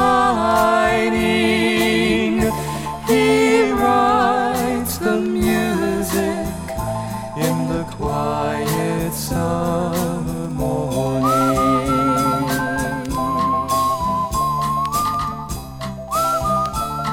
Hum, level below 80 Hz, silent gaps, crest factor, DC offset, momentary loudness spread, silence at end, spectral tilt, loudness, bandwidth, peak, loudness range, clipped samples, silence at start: none; -36 dBFS; none; 16 dB; under 0.1%; 9 LU; 0 s; -5 dB/octave; -19 LUFS; 17.5 kHz; -2 dBFS; 5 LU; under 0.1%; 0 s